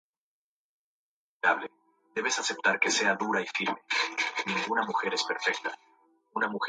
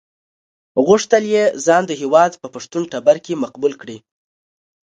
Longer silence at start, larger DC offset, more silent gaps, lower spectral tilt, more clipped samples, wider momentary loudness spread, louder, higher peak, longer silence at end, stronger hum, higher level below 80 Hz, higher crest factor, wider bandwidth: first, 1.45 s vs 0.75 s; neither; neither; second, -1.5 dB/octave vs -4.5 dB/octave; neither; about the same, 10 LU vs 12 LU; second, -28 LUFS vs -16 LUFS; second, -10 dBFS vs 0 dBFS; second, 0 s vs 0.9 s; neither; second, -82 dBFS vs -66 dBFS; about the same, 22 dB vs 18 dB; about the same, 9.6 kHz vs 9.2 kHz